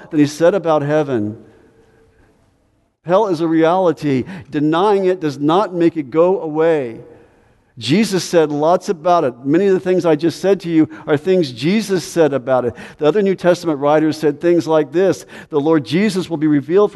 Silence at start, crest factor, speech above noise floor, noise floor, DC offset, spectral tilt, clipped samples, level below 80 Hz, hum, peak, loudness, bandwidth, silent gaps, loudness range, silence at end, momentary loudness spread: 0 s; 16 dB; 45 dB; -60 dBFS; under 0.1%; -6.5 dB/octave; under 0.1%; -58 dBFS; none; 0 dBFS; -16 LUFS; 12 kHz; none; 3 LU; 0.05 s; 6 LU